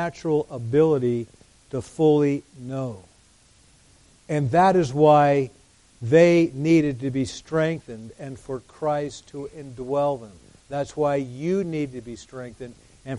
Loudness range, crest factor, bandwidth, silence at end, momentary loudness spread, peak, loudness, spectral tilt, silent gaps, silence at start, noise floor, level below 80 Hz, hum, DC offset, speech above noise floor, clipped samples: 9 LU; 18 dB; 11.5 kHz; 0 s; 20 LU; -4 dBFS; -22 LUFS; -7 dB/octave; none; 0 s; -56 dBFS; -56 dBFS; none; under 0.1%; 34 dB; under 0.1%